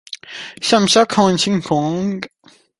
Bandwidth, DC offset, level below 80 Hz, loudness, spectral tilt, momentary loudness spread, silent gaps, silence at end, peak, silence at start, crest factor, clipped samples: 11.5 kHz; under 0.1%; -54 dBFS; -16 LUFS; -4 dB/octave; 18 LU; none; 0.5 s; -2 dBFS; 0.1 s; 16 dB; under 0.1%